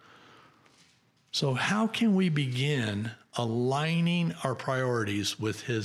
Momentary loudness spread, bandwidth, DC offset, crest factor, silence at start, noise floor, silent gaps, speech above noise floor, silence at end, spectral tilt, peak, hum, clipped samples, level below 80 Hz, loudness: 7 LU; 14.5 kHz; under 0.1%; 18 dB; 1.35 s; -65 dBFS; none; 37 dB; 0 s; -5.5 dB/octave; -12 dBFS; none; under 0.1%; -72 dBFS; -29 LUFS